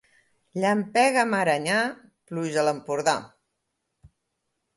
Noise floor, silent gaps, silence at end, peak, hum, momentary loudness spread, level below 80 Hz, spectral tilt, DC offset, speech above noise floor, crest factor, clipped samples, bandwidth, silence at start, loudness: -79 dBFS; none; 0.7 s; -6 dBFS; none; 10 LU; -70 dBFS; -4 dB/octave; under 0.1%; 55 dB; 20 dB; under 0.1%; 12 kHz; 0.55 s; -24 LUFS